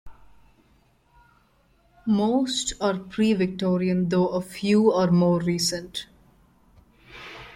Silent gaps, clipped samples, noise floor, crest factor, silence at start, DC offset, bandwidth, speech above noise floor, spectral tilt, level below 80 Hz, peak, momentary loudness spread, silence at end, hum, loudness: none; under 0.1%; -62 dBFS; 18 dB; 0.05 s; under 0.1%; 15 kHz; 39 dB; -5.5 dB/octave; -56 dBFS; -8 dBFS; 15 LU; 0 s; none; -23 LUFS